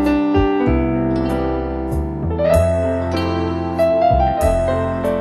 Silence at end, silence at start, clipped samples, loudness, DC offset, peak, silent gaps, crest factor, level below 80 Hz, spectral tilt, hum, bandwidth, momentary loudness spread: 0 s; 0 s; under 0.1%; -18 LUFS; under 0.1%; -4 dBFS; none; 14 dB; -26 dBFS; -7.5 dB/octave; none; 12.5 kHz; 7 LU